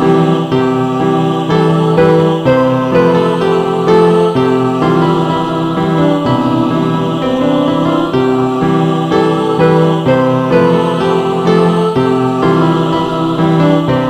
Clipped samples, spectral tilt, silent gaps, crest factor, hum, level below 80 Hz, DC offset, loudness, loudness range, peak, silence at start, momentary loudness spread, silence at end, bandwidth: under 0.1%; -7.5 dB/octave; none; 10 dB; none; -42 dBFS; under 0.1%; -11 LUFS; 2 LU; 0 dBFS; 0 s; 4 LU; 0 s; 10 kHz